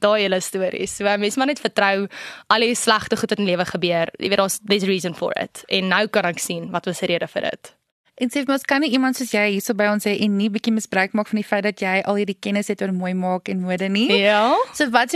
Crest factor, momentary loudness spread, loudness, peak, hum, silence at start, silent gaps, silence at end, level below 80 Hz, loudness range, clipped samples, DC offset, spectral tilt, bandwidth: 18 dB; 7 LU; -20 LUFS; -2 dBFS; none; 0 s; 7.92-8.04 s; 0 s; -62 dBFS; 3 LU; under 0.1%; under 0.1%; -4 dB/octave; 13.5 kHz